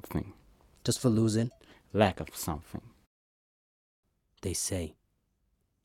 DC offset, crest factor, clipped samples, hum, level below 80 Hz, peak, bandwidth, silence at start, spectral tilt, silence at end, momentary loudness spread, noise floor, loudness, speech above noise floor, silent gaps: under 0.1%; 26 dB; under 0.1%; none; -54 dBFS; -8 dBFS; 17 kHz; 0.05 s; -5 dB/octave; 0.95 s; 15 LU; -76 dBFS; -31 LUFS; 46 dB; 3.07-4.03 s